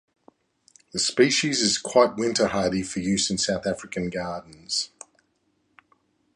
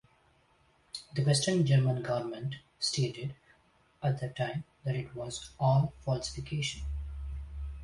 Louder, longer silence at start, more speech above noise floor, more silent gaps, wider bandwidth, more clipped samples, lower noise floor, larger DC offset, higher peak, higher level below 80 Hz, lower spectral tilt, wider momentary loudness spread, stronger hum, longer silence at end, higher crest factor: first, -23 LUFS vs -33 LUFS; about the same, 0.95 s vs 0.95 s; first, 46 dB vs 37 dB; neither; about the same, 11.5 kHz vs 11.5 kHz; neither; about the same, -70 dBFS vs -67 dBFS; neither; first, -4 dBFS vs -16 dBFS; second, -56 dBFS vs -46 dBFS; second, -3 dB/octave vs -5.5 dB/octave; second, 11 LU vs 15 LU; neither; first, 1.5 s vs 0 s; about the same, 22 dB vs 18 dB